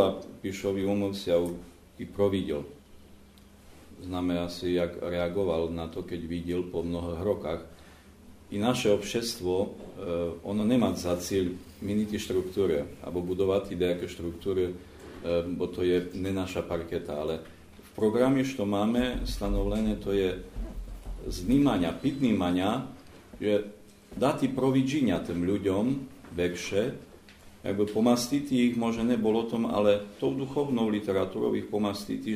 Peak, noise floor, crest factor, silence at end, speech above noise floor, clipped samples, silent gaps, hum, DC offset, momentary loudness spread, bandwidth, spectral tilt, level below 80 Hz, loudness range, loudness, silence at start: -8 dBFS; -54 dBFS; 20 dB; 0 s; 25 dB; under 0.1%; none; none; under 0.1%; 12 LU; 15.5 kHz; -6 dB/octave; -46 dBFS; 5 LU; -29 LUFS; 0 s